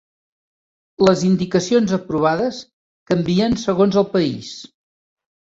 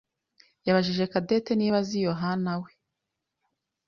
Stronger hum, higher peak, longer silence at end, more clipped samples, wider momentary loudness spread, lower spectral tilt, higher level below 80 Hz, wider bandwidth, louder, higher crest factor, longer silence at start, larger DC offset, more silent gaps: neither; first, -2 dBFS vs -8 dBFS; second, 0.75 s vs 1.2 s; neither; about the same, 11 LU vs 9 LU; about the same, -6 dB/octave vs -6.5 dB/octave; first, -50 dBFS vs -64 dBFS; about the same, 7.8 kHz vs 7.2 kHz; first, -18 LUFS vs -27 LUFS; about the same, 18 dB vs 20 dB; first, 1 s vs 0.65 s; neither; first, 2.73-3.06 s vs none